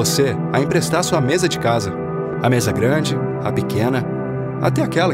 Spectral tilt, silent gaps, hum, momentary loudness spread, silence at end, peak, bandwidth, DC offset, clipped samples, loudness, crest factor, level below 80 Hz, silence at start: -5 dB/octave; none; none; 7 LU; 0 s; -4 dBFS; 16 kHz; under 0.1%; under 0.1%; -19 LUFS; 14 dB; -48 dBFS; 0 s